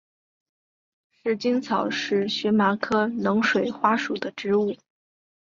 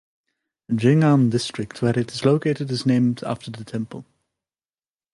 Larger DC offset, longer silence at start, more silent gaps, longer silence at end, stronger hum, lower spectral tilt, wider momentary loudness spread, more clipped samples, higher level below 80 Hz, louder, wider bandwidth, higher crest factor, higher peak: neither; first, 1.25 s vs 0.7 s; neither; second, 0.65 s vs 1.1 s; neither; second, -5.5 dB/octave vs -7 dB/octave; second, 8 LU vs 14 LU; neither; second, -68 dBFS vs -60 dBFS; second, -24 LUFS vs -21 LUFS; second, 7.4 kHz vs 11.5 kHz; about the same, 18 dB vs 18 dB; about the same, -6 dBFS vs -4 dBFS